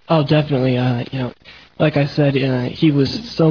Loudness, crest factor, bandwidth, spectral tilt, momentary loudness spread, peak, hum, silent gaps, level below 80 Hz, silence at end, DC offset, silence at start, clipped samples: -17 LUFS; 14 dB; 5.4 kHz; -8 dB/octave; 7 LU; -2 dBFS; none; none; -48 dBFS; 0 s; under 0.1%; 0.1 s; under 0.1%